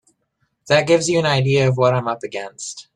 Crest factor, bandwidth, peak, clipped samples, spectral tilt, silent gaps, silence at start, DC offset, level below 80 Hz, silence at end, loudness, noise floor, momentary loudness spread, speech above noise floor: 16 dB; 11 kHz; -2 dBFS; under 0.1%; -5 dB/octave; none; 0.65 s; under 0.1%; -56 dBFS; 0.15 s; -17 LUFS; -69 dBFS; 14 LU; 51 dB